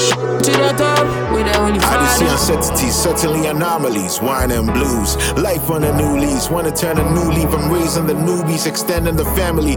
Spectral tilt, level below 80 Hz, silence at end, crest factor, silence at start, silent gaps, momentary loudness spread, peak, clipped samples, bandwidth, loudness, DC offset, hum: -4.5 dB/octave; -26 dBFS; 0 s; 14 dB; 0 s; none; 4 LU; -2 dBFS; under 0.1%; over 20 kHz; -15 LUFS; under 0.1%; none